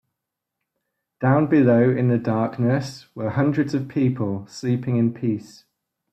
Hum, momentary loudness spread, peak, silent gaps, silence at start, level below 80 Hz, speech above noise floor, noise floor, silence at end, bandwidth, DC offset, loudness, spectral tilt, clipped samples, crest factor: none; 11 LU; -4 dBFS; none; 1.2 s; -62 dBFS; 62 dB; -83 dBFS; 0.7 s; 8.6 kHz; under 0.1%; -21 LUFS; -8.5 dB/octave; under 0.1%; 16 dB